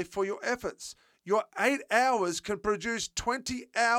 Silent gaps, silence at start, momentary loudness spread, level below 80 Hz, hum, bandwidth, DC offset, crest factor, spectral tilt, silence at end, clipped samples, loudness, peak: none; 0 s; 11 LU; -58 dBFS; none; 17.5 kHz; under 0.1%; 20 dB; -2.5 dB/octave; 0 s; under 0.1%; -30 LUFS; -10 dBFS